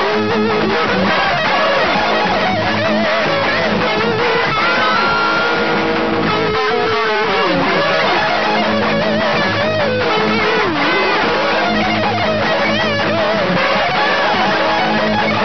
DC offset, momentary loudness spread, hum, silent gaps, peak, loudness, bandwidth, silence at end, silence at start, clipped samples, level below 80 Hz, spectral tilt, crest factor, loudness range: 2%; 2 LU; none; none; -2 dBFS; -14 LUFS; 6.4 kHz; 0 s; 0 s; under 0.1%; -42 dBFS; -5 dB/octave; 12 dB; 0 LU